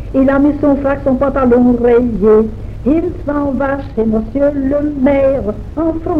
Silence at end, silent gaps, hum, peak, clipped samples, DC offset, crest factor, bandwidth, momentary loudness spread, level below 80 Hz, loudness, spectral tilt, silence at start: 0 s; none; none; -2 dBFS; under 0.1%; under 0.1%; 12 dB; 5.2 kHz; 8 LU; -28 dBFS; -13 LUFS; -10 dB/octave; 0 s